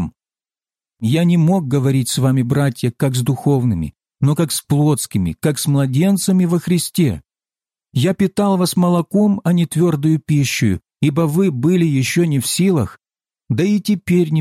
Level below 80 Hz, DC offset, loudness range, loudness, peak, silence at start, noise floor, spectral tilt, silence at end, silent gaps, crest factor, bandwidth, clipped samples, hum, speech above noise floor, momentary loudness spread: -46 dBFS; under 0.1%; 1 LU; -17 LUFS; -4 dBFS; 0 s; under -90 dBFS; -6 dB/octave; 0 s; none; 12 dB; 16 kHz; under 0.1%; none; over 75 dB; 5 LU